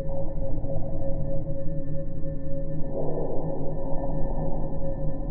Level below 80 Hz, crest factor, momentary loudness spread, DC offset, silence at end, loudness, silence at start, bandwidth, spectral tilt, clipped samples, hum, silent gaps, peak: -30 dBFS; 10 dB; 3 LU; under 0.1%; 0 s; -32 LUFS; 0 s; 1.9 kHz; -14 dB/octave; under 0.1%; none; none; -10 dBFS